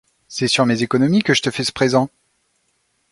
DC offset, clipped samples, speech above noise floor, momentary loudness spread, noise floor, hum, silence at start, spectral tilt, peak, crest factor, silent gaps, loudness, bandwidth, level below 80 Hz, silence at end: under 0.1%; under 0.1%; 49 dB; 7 LU; -66 dBFS; none; 0.3 s; -4.5 dB/octave; -2 dBFS; 18 dB; none; -17 LUFS; 11.5 kHz; -56 dBFS; 1.05 s